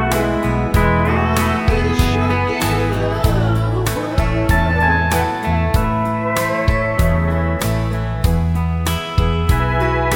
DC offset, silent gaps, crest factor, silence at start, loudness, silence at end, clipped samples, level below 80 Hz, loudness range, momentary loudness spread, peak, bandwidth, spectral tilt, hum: under 0.1%; none; 14 dB; 0 s; -17 LUFS; 0 s; under 0.1%; -22 dBFS; 1 LU; 4 LU; -2 dBFS; 18 kHz; -6 dB/octave; none